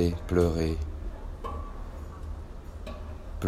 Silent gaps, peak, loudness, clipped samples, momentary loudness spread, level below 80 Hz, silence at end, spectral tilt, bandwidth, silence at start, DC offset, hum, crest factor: none; -10 dBFS; -33 LUFS; under 0.1%; 16 LU; -38 dBFS; 0 s; -7.5 dB/octave; 14 kHz; 0 s; under 0.1%; none; 20 dB